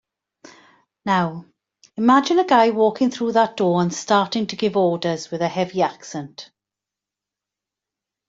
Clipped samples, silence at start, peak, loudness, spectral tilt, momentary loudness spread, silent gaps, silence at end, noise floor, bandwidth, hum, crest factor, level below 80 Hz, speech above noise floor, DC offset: under 0.1%; 1.05 s; -4 dBFS; -19 LUFS; -5.5 dB/octave; 16 LU; none; 1.85 s; -87 dBFS; 7.8 kHz; none; 18 dB; -66 dBFS; 68 dB; under 0.1%